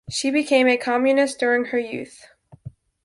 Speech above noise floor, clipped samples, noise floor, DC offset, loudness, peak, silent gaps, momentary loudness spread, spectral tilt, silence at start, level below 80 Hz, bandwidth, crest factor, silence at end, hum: 22 dB; under 0.1%; -42 dBFS; under 0.1%; -20 LUFS; -4 dBFS; none; 14 LU; -3.5 dB/octave; 0.1 s; -60 dBFS; 11.5 kHz; 16 dB; 0.35 s; none